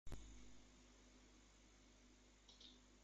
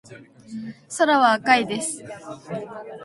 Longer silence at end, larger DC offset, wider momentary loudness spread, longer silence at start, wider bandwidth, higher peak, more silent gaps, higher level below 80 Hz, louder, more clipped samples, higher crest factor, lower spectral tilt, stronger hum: about the same, 0 s vs 0 s; neither; second, 8 LU vs 20 LU; about the same, 0.05 s vs 0.1 s; second, 8.8 kHz vs 11.5 kHz; second, -42 dBFS vs -2 dBFS; neither; about the same, -66 dBFS vs -68 dBFS; second, -66 LUFS vs -19 LUFS; neither; about the same, 18 dB vs 20 dB; about the same, -3.5 dB/octave vs -3 dB/octave; first, 50 Hz at -70 dBFS vs none